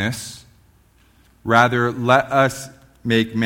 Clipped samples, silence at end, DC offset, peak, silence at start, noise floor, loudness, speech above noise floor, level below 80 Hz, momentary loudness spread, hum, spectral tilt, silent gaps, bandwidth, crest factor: under 0.1%; 0 s; under 0.1%; 0 dBFS; 0 s; -55 dBFS; -18 LUFS; 37 dB; -54 dBFS; 18 LU; none; -5 dB/octave; none; 17 kHz; 20 dB